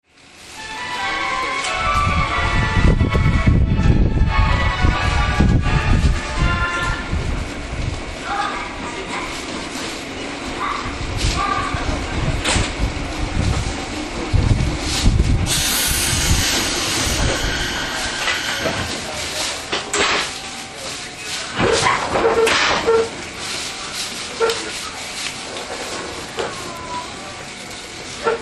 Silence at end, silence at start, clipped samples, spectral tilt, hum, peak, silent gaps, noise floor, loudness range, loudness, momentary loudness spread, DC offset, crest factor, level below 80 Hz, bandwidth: 0 s; 0.35 s; under 0.1%; -4 dB/octave; none; 0 dBFS; none; -42 dBFS; 7 LU; -20 LUFS; 11 LU; under 0.1%; 18 dB; -24 dBFS; 13 kHz